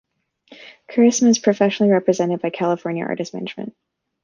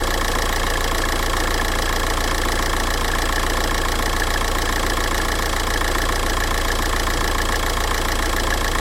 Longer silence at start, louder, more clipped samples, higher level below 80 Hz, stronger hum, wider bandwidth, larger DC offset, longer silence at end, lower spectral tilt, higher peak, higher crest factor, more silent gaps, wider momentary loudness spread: first, 0.6 s vs 0 s; about the same, -19 LUFS vs -21 LUFS; neither; second, -66 dBFS vs -24 dBFS; neither; second, 7.4 kHz vs 16.5 kHz; neither; first, 0.55 s vs 0 s; first, -5 dB/octave vs -3 dB/octave; first, -2 dBFS vs -6 dBFS; about the same, 16 dB vs 14 dB; neither; first, 14 LU vs 0 LU